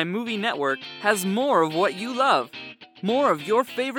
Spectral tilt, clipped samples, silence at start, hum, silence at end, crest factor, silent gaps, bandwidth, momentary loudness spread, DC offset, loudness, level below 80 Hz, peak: -4.5 dB/octave; under 0.1%; 0 s; none; 0 s; 18 dB; none; 19 kHz; 8 LU; under 0.1%; -23 LUFS; -78 dBFS; -6 dBFS